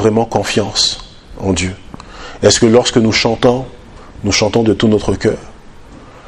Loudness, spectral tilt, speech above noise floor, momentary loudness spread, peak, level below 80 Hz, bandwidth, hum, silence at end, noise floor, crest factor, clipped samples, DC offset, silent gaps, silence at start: -13 LUFS; -4 dB/octave; 23 dB; 16 LU; 0 dBFS; -36 dBFS; 12.5 kHz; none; 0 s; -36 dBFS; 14 dB; 0.1%; under 0.1%; none; 0 s